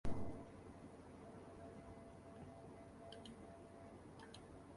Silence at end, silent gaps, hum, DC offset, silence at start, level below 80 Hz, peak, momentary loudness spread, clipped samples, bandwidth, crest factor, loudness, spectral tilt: 0 s; none; none; under 0.1%; 0.05 s; -62 dBFS; -28 dBFS; 5 LU; under 0.1%; 11.5 kHz; 22 dB; -57 LUFS; -6.5 dB/octave